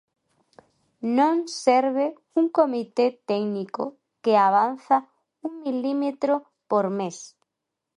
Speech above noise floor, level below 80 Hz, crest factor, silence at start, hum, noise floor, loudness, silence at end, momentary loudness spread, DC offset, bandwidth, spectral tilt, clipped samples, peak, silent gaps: 61 dB; -78 dBFS; 20 dB; 1 s; none; -84 dBFS; -24 LUFS; 0.7 s; 12 LU; under 0.1%; 11 kHz; -5.5 dB/octave; under 0.1%; -6 dBFS; none